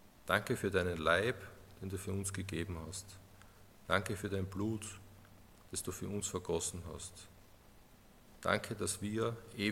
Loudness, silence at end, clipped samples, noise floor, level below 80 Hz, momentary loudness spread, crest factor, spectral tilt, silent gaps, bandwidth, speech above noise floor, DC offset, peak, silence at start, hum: -38 LUFS; 0 s; under 0.1%; -61 dBFS; -60 dBFS; 15 LU; 26 dB; -4 dB/octave; none; 16.5 kHz; 24 dB; under 0.1%; -12 dBFS; 0 s; none